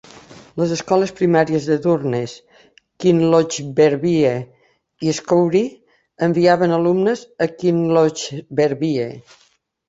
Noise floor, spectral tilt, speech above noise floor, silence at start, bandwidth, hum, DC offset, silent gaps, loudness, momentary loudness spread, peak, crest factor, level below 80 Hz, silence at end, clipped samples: -43 dBFS; -6 dB/octave; 26 dB; 0.3 s; 8 kHz; none; under 0.1%; none; -18 LUFS; 10 LU; -2 dBFS; 16 dB; -58 dBFS; 0.7 s; under 0.1%